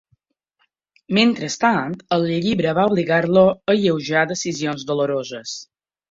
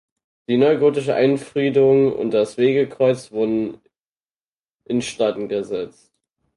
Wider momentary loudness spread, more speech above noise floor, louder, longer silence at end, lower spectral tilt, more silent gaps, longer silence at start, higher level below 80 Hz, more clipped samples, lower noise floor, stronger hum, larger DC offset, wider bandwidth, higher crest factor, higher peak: about the same, 9 LU vs 10 LU; second, 50 dB vs over 72 dB; about the same, -19 LUFS vs -19 LUFS; second, 0.5 s vs 0.7 s; second, -5 dB/octave vs -6.5 dB/octave; second, none vs 4.01-4.05 s, 4.16-4.20 s, 4.48-4.64 s, 4.71-4.79 s; first, 1.1 s vs 0.5 s; about the same, -58 dBFS vs -60 dBFS; neither; second, -69 dBFS vs under -90 dBFS; neither; neither; second, 7.8 kHz vs 11.5 kHz; about the same, 18 dB vs 16 dB; about the same, -2 dBFS vs -4 dBFS